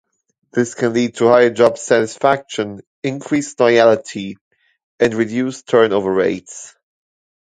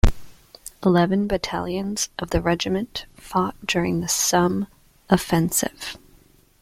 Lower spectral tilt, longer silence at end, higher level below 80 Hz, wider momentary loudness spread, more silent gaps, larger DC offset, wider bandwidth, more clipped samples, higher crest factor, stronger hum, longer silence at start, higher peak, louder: about the same, -5 dB/octave vs -4.5 dB/octave; first, 0.8 s vs 0.65 s; second, -58 dBFS vs -34 dBFS; about the same, 15 LU vs 15 LU; first, 2.87-3.02 s, 4.41-4.51 s, 4.84-4.98 s vs none; neither; second, 9.4 kHz vs 16.5 kHz; neither; about the same, 16 dB vs 20 dB; neither; first, 0.55 s vs 0.05 s; about the same, 0 dBFS vs -2 dBFS; first, -16 LUFS vs -22 LUFS